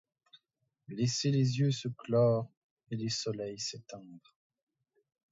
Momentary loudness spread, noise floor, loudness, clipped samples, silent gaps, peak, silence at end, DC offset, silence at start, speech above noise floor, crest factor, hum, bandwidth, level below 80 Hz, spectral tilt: 18 LU; -81 dBFS; -32 LUFS; under 0.1%; 2.57-2.77 s; -16 dBFS; 1.15 s; under 0.1%; 0.9 s; 48 dB; 18 dB; none; 7.8 kHz; -74 dBFS; -5.5 dB/octave